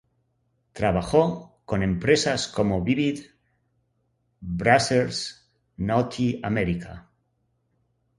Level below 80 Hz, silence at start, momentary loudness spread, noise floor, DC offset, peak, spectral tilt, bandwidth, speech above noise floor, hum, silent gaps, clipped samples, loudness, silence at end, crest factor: -46 dBFS; 0.75 s; 13 LU; -72 dBFS; under 0.1%; -4 dBFS; -5.5 dB/octave; 11.5 kHz; 48 dB; none; none; under 0.1%; -24 LUFS; 1.2 s; 22 dB